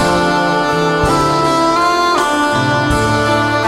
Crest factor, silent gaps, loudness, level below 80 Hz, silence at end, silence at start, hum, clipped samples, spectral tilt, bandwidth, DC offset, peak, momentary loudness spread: 12 dB; none; -13 LUFS; -32 dBFS; 0 s; 0 s; none; under 0.1%; -4.5 dB/octave; 16 kHz; 0.3%; -2 dBFS; 1 LU